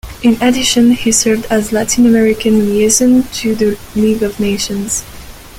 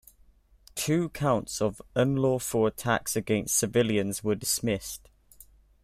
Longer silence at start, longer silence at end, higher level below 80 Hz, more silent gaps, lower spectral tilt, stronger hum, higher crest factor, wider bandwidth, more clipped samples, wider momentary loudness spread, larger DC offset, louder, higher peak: second, 0.05 s vs 0.75 s; second, 0 s vs 0.4 s; first, -36 dBFS vs -54 dBFS; neither; about the same, -3.5 dB/octave vs -4.5 dB/octave; neither; second, 12 dB vs 18 dB; about the same, 16.5 kHz vs 16 kHz; neither; about the same, 8 LU vs 7 LU; neither; first, -12 LUFS vs -27 LUFS; first, 0 dBFS vs -10 dBFS